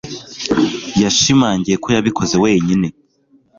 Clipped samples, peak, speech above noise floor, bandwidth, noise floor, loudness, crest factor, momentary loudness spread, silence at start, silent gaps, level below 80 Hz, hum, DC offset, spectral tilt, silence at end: under 0.1%; -2 dBFS; 41 dB; 7.6 kHz; -55 dBFS; -15 LUFS; 14 dB; 8 LU; 0.05 s; none; -44 dBFS; none; under 0.1%; -4.5 dB/octave; 0.7 s